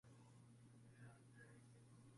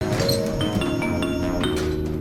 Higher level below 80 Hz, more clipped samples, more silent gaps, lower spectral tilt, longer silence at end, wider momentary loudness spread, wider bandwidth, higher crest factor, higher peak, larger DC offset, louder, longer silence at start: second, -86 dBFS vs -36 dBFS; neither; neither; about the same, -6 dB/octave vs -5.5 dB/octave; about the same, 0 s vs 0 s; about the same, 3 LU vs 3 LU; second, 11.5 kHz vs 18 kHz; about the same, 14 dB vs 14 dB; second, -52 dBFS vs -8 dBFS; neither; second, -66 LUFS vs -23 LUFS; about the same, 0.05 s vs 0 s